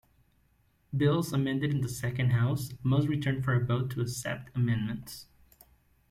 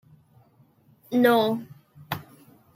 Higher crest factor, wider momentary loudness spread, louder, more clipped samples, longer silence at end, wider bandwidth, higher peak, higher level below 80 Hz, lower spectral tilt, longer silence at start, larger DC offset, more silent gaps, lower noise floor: about the same, 16 dB vs 20 dB; second, 9 LU vs 16 LU; second, -30 LUFS vs -24 LUFS; neither; first, 0.85 s vs 0.55 s; about the same, 15.5 kHz vs 16.5 kHz; second, -14 dBFS vs -8 dBFS; first, -58 dBFS vs -68 dBFS; about the same, -6.5 dB/octave vs -6 dB/octave; second, 0.9 s vs 1.1 s; neither; neither; first, -68 dBFS vs -59 dBFS